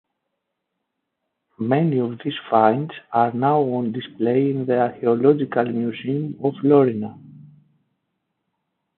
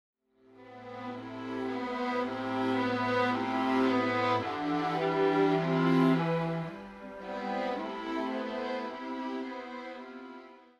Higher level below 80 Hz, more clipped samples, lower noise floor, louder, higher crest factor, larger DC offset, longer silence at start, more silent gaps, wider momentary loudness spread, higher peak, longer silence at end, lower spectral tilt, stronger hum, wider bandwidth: about the same, -70 dBFS vs -68 dBFS; neither; first, -79 dBFS vs -59 dBFS; first, -20 LUFS vs -31 LUFS; about the same, 18 dB vs 18 dB; neither; first, 1.6 s vs 0.6 s; neither; second, 9 LU vs 17 LU; first, -2 dBFS vs -14 dBFS; first, 1.55 s vs 0.2 s; first, -12 dB/octave vs -7 dB/octave; neither; second, 4.3 kHz vs 9.6 kHz